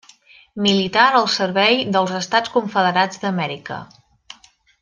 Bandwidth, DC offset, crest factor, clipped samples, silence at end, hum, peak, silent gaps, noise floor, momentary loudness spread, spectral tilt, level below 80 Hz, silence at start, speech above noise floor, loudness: 9.8 kHz; under 0.1%; 18 dB; under 0.1%; 0.95 s; none; -2 dBFS; none; -51 dBFS; 14 LU; -4 dB/octave; -62 dBFS; 0.55 s; 33 dB; -17 LUFS